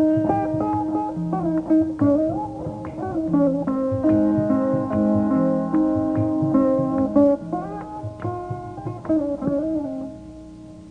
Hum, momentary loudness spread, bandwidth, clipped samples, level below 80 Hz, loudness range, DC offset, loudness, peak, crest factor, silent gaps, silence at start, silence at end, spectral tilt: none; 13 LU; 5.4 kHz; under 0.1%; -48 dBFS; 4 LU; under 0.1%; -22 LUFS; -6 dBFS; 16 dB; none; 0 s; 0 s; -10.5 dB/octave